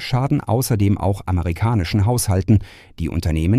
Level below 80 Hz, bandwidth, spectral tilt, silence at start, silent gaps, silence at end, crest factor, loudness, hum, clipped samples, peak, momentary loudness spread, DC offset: -32 dBFS; 15.5 kHz; -6.5 dB/octave; 0 s; none; 0 s; 16 dB; -19 LUFS; none; under 0.1%; -2 dBFS; 5 LU; under 0.1%